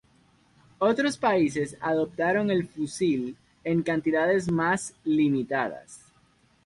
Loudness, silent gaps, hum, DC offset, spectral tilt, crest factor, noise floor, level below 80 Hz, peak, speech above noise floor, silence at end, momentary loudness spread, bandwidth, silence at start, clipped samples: -26 LUFS; none; none; under 0.1%; -5.5 dB/octave; 16 dB; -63 dBFS; -62 dBFS; -10 dBFS; 37 dB; 0.7 s; 7 LU; 11.5 kHz; 0.8 s; under 0.1%